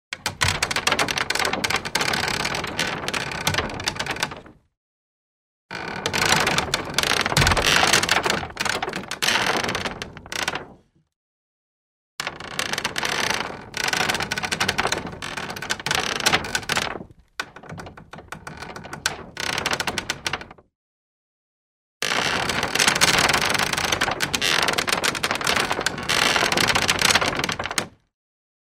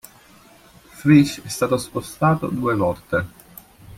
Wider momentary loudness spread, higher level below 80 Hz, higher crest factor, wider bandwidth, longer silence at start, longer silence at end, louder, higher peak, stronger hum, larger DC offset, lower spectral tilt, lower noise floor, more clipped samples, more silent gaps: first, 15 LU vs 10 LU; first, -44 dBFS vs -52 dBFS; about the same, 22 dB vs 20 dB; about the same, 16 kHz vs 16 kHz; second, 0.1 s vs 0.95 s; first, 0.8 s vs 0.05 s; about the same, -22 LUFS vs -20 LUFS; about the same, -2 dBFS vs -2 dBFS; neither; neither; second, -2 dB/octave vs -6.5 dB/octave; about the same, -51 dBFS vs -49 dBFS; neither; first, 4.77-5.69 s, 11.16-12.18 s, 20.75-22.00 s vs none